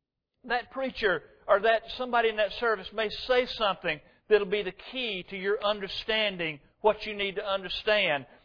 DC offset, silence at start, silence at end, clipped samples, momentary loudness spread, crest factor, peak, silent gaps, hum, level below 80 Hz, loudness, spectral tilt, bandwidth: under 0.1%; 0.45 s; 0.2 s; under 0.1%; 8 LU; 20 dB; -10 dBFS; none; none; -56 dBFS; -28 LUFS; -5 dB/octave; 5.4 kHz